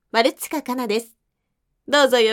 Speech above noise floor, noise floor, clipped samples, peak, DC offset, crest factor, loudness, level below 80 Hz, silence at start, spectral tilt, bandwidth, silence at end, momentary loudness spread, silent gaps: 56 dB; -75 dBFS; under 0.1%; -2 dBFS; under 0.1%; 18 dB; -20 LUFS; -72 dBFS; 0.15 s; -2 dB/octave; 18 kHz; 0 s; 10 LU; none